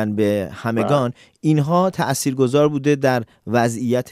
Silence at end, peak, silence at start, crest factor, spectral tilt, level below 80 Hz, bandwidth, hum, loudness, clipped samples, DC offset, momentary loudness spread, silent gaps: 0 s; -4 dBFS; 0 s; 14 dB; -6 dB/octave; -58 dBFS; 15.5 kHz; none; -19 LUFS; under 0.1%; under 0.1%; 6 LU; none